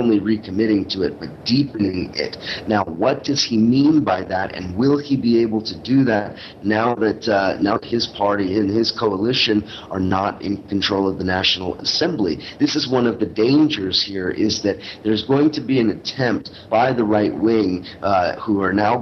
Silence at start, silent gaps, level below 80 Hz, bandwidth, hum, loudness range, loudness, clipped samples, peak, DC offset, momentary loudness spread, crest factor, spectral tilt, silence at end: 0 s; none; -50 dBFS; 6.8 kHz; none; 2 LU; -19 LUFS; under 0.1%; -4 dBFS; under 0.1%; 7 LU; 16 dB; -5.5 dB/octave; 0 s